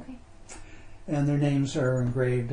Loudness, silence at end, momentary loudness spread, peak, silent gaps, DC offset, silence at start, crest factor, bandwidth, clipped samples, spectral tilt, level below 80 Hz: -27 LUFS; 0 s; 22 LU; -14 dBFS; none; under 0.1%; 0 s; 14 dB; 10 kHz; under 0.1%; -7.5 dB/octave; -48 dBFS